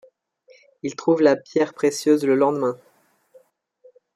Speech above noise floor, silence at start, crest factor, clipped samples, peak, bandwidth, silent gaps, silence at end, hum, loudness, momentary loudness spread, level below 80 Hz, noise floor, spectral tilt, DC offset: 41 dB; 0.85 s; 18 dB; under 0.1%; -4 dBFS; 14.5 kHz; none; 1.4 s; none; -20 LUFS; 13 LU; -74 dBFS; -61 dBFS; -5.5 dB/octave; under 0.1%